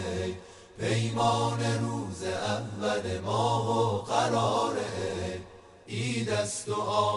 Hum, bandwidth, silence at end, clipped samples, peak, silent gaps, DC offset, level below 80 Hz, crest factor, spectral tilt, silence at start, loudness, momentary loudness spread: none; 11.5 kHz; 0 s; under 0.1%; -12 dBFS; none; under 0.1%; -58 dBFS; 18 dB; -5 dB/octave; 0 s; -29 LUFS; 9 LU